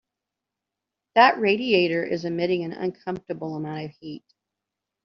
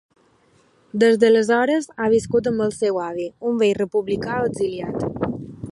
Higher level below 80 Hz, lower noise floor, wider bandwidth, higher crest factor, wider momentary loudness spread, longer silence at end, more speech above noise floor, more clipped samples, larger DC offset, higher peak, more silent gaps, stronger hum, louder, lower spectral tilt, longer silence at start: second, -68 dBFS vs -52 dBFS; first, -86 dBFS vs -58 dBFS; second, 6.4 kHz vs 11.5 kHz; about the same, 22 dB vs 18 dB; first, 18 LU vs 11 LU; first, 0.85 s vs 0 s; first, 62 dB vs 38 dB; neither; neither; about the same, -4 dBFS vs -4 dBFS; neither; neither; second, -23 LUFS vs -20 LUFS; second, -3 dB/octave vs -5.5 dB/octave; first, 1.15 s vs 0.95 s